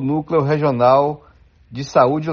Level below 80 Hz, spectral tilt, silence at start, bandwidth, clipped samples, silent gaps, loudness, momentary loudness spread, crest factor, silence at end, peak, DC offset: -52 dBFS; -6.5 dB/octave; 0 s; 7.2 kHz; under 0.1%; none; -16 LUFS; 18 LU; 16 dB; 0 s; 0 dBFS; under 0.1%